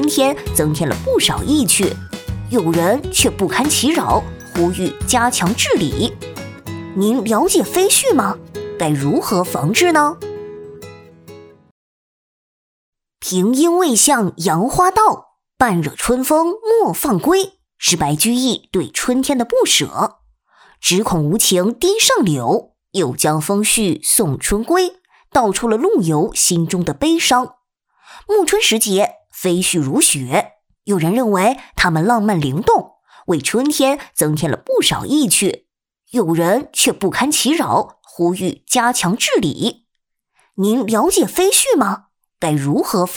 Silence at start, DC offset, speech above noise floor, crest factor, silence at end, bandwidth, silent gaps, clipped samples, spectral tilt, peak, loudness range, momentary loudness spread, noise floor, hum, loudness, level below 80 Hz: 0 s; under 0.1%; 58 dB; 16 dB; 0 s; over 20 kHz; 11.71-12.93 s; under 0.1%; -3.5 dB/octave; 0 dBFS; 3 LU; 9 LU; -73 dBFS; none; -15 LUFS; -40 dBFS